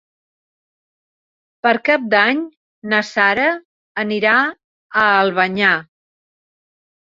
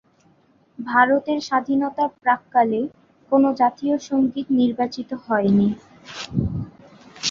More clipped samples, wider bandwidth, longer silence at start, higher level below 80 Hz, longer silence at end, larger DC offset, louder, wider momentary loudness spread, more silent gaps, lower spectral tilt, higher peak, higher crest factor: neither; about the same, 7.8 kHz vs 7.6 kHz; first, 1.65 s vs 0.8 s; second, -64 dBFS vs -48 dBFS; first, 1.3 s vs 0 s; neither; first, -16 LUFS vs -21 LUFS; second, 10 LU vs 14 LU; first, 2.57-2.82 s, 3.65-3.95 s, 4.64-4.90 s vs none; about the same, -5 dB/octave vs -5.5 dB/octave; about the same, 0 dBFS vs -2 dBFS; about the same, 18 dB vs 20 dB